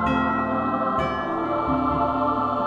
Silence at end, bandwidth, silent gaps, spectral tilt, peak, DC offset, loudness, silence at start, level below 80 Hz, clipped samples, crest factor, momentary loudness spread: 0 s; 7.8 kHz; none; -8 dB/octave; -10 dBFS; under 0.1%; -23 LUFS; 0 s; -42 dBFS; under 0.1%; 14 dB; 3 LU